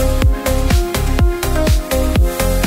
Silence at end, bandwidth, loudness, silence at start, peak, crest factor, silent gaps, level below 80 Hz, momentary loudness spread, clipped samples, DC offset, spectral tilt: 0 s; 16.5 kHz; -16 LUFS; 0 s; -2 dBFS; 12 dB; none; -16 dBFS; 1 LU; under 0.1%; under 0.1%; -5.5 dB/octave